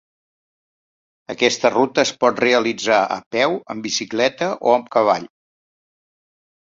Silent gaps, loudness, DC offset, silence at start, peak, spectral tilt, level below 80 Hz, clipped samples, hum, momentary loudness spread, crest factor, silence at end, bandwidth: 3.26-3.31 s; -18 LUFS; under 0.1%; 1.3 s; -2 dBFS; -3 dB/octave; -64 dBFS; under 0.1%; none; 6 LU; 18 dB; 1.4 s; 7.8 kHz